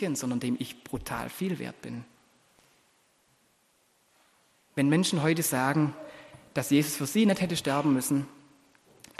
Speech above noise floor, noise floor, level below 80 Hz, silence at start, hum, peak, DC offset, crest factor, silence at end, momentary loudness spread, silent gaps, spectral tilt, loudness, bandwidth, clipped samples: 40 dB; -68 dBFS; -62 dBFS; 0 s; none; -12 dBFS; under 0.1%; 18 dB; 0.85 s; 16 LU; none; -5 dB/octave; -28 LUFS; 13 kHz; under 0.1%